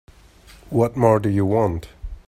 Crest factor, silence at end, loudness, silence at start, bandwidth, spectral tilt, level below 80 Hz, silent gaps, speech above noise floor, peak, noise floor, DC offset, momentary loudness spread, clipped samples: 20 dB; 0.1 s; -20 LUFS; 0.7 s; 14 kHz; -8.5 dB/octave; -40 dBFS; none; 29 dB; -2 dBFS; -48 dBFS; under 0.1%; 12 LU; under 0.1%